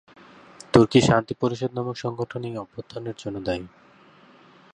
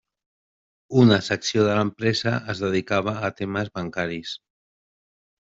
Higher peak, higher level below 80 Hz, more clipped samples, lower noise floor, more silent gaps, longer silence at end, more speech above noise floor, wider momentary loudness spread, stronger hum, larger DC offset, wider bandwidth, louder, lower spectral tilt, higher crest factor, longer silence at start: about the same, -2 dBFS vs -4 dBFS; first, -52 dBFS vs -60 dBFS; neither; second, -53 dBFS vs under -90 dBFS; neither; second, 1.05 s vs 1.25 s; second, 28 dB vs over 68 dB; first, 17 LU vs 11 LU; neither; neither; first, 11 kHz vs 8 kHz; about the same, -24 LUFS vs -23 LUFS; about the same, -6 dB/octave vs -5.5 dB/octave; about the same, 24 dB vs 20 dB; second, 0.75 s vs 0.9 s